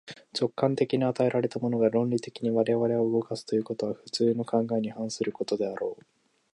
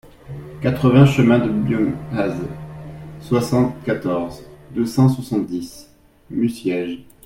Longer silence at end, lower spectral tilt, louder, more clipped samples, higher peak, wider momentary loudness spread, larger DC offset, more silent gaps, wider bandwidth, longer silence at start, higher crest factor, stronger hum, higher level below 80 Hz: first, 0.6 s vs 0.25 s; about the same, -6.5 dB/octave vs -7.5 dB/octave; second, -28 LUFS vs -19 LUFS; neither; second, -10 dBFS vs 0 dBFS; second, 7 LU vs 22 LU; neither; neither; second, 11.5 kHz vs 16 kHz; second, 0.05 s vs 0.25 s; about the same, 18 dB vs 18 dB; neither; second, -72 dBFS vs -46 dBFS